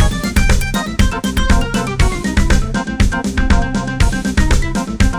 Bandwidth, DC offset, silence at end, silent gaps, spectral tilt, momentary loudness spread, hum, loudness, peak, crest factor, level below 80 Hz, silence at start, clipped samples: 19.5 kHz; under 0.1%; 0 s; none; -5 dB/octave; 3 LU; none; -16 LUFS; -2 dBFS; 12 dB; -16 dBFS; 0 s; under 0.1%